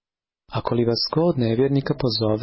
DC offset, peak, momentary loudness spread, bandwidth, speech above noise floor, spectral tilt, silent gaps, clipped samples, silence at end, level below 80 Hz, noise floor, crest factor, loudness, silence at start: under 0.1%; -10 dBFS; 6 LU; 6 kHz; 42 dB; -9.5 dB/octave; none; under 0.1%; 0 s; -48 dBFS; -62 dBFS; 12 dB; -22 LUFS; 0.5 s